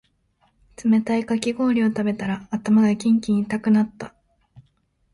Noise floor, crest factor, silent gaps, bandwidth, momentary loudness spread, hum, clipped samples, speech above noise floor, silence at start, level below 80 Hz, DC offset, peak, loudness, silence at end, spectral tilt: -65 dBFS; 16 dB; none; 11.5 kHz; 9 LU; none; under 0.1%; 45 dB; 0.8 s; -58 dBFS; under 0.1%; -6 dBFS; -21 LUFS; 0.55 s; -6.5 dB/octave